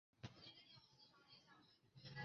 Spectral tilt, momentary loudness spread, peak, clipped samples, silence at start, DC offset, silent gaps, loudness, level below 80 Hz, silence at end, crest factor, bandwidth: -3 dB/octave; 9 LU; -40 dBFS; under 0.1%; 0.15 s; under 0.1%; none; -63 LUFS; -82 dBFS; 0 s; 22 dB; 7 kHz